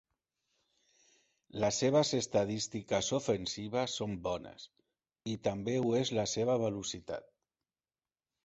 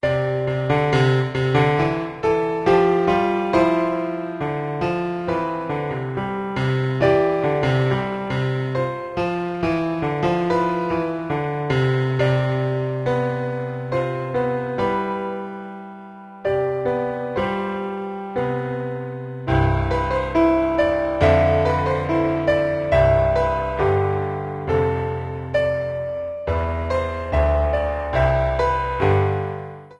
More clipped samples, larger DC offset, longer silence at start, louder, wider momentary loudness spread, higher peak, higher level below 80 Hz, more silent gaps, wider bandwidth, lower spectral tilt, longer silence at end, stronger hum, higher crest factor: neither; neither; first, 1.55 s vs 0.05 s; second, -34 LUFS vs -21 LUFS; first, 15 LU vs 9 LU; second, -16 dBFS vs -4 dBFS; second, -64 dBFS vs -34 dBFS; neither; second, 8 kHz vs 10 kHz; second, -5 dB/octave vs -8 dB/octave; first, 1.25 s vs 0.05 s; neither; about the same, 20 dB vs 16 dB